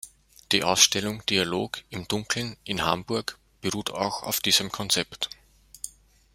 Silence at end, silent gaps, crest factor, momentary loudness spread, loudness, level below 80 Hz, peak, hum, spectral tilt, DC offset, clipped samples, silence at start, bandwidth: 0.45 s; none; 26 dB; 17 LU; -25 LUFS; -58 dBFS; -2 dBFS; none; -2 dB/octave; under 0.1%; under 0.1%; 0.05 s; 16 kHz